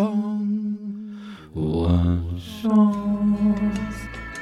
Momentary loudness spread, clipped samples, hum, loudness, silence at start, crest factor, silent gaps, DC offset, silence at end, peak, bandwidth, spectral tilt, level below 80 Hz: 15 LU; under 0.1%; none; -23 LUFS; 0 s; 14 dB; none; under 0.1%; 0 s; -8 dBFS; 11.5 kHz; -8 dB/octave; -38 dBFS